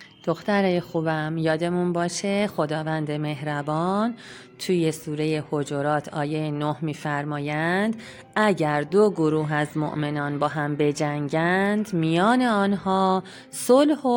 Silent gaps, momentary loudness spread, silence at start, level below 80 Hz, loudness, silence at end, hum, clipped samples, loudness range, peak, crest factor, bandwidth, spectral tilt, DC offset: none; 8 LU; 0 s; -64 dBFS; -24 LUFS; 0 s; none; under 0.1%; 4 LU; -6 dBFS; 16 dB; 17 kHz; -6 dB/octave; under 0.1%